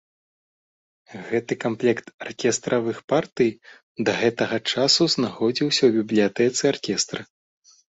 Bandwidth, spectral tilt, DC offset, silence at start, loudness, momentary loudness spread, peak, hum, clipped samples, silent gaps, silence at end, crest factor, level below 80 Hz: 8.2 kHz; -3.5 dB/octave; under 0.1%; 1.1 s; -22 LUFS; 9 LU; -6 dBFS; none; under 0.1%; 2.14-2.19 s, 3.04-3.08 s, 3.83-3.95 s; 0.7 s; 18 dB; -64 dBFS